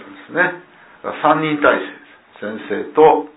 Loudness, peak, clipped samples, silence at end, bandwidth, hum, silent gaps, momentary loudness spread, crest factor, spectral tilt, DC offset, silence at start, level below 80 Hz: -16 LUFS; 0 dBFS; under 0.1%; 0.1 s; 4 kHz; none; none; 18 LU; 18 dB; -9.5 dB/octave; under 0.1%; 0 s; -58 dBFS